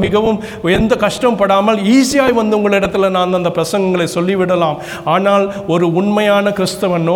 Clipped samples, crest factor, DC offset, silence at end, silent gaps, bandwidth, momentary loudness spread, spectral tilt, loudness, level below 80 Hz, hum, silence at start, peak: under 0.1%; 12 dB; under 0.1%; 0 s; none; 18 kHz; 5 LU; -5.5 dB/octave; -13 LUFS; -40 dBFS; none; 0 s; 0 dBFS